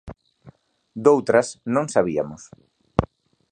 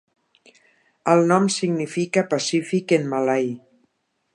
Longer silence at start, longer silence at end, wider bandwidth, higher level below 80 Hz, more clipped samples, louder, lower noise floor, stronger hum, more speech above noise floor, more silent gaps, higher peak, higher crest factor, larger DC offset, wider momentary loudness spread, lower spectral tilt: second, 0.05 s vs 1.05 s; second, 0.45 s vs 0.75 s; second, 9.8 kHz vs 11 kHz; first, -46 dBFS vs -74 dBFS; neither; about the same, -21 LUFS vs -21 LUFS; second, -51 dBFS vs -69 dBFS; neither; second, 31 dB vs 49 dB; neither; about the same, 0 dBFS vs -2 dBFS; about the same, 22 dB vs 20 dB; neither; first, 20 LU vs 8 LU; about the same, -6 dB/octave vs -5 dB/octave